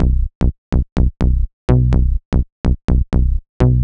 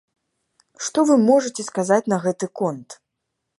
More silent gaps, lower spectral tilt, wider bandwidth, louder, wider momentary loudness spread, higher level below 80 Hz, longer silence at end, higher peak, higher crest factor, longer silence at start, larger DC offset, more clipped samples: first, 0.35-0.41 s, 0.58-0.72 s, 0.92-0.96 s, 1.53-1.68 s, 2.25-2.32 s, 2.52-2.64 s, 2.84-2.88 s, 3.49-3.60 s vs none; first, -9.5 dB/octave vs -5 dB/octave; second, 5.4 kHz vs 11.5 kHz; about the same, -18 LUFS vs -20 LUFS; second, 6 LU vs 11 LU; first, -16 dBFS vs -72 dBFS; second, 0 s vs 0.65 s; first, 0 dBFS vs -4 dBFS; about the same, 14 dB vs 18 dB; second, 0 s vs 0.8 s; neither; neither